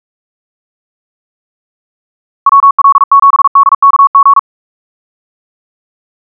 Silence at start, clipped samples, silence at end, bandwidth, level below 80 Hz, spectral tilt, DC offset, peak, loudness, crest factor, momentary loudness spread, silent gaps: 2.45 s; under 0.1%; 1.8 s; 1.7 kHz; -86 dBFS; -0.5 dB/octave; under 0.1%; 0 dBFS; -6 LUFS; 10 dB; 3 LU; 2.71-2.78 s, 3.04-3.11 s, 3.48-3.55 s, 3.75-3.82 s, 4.07-4.14 s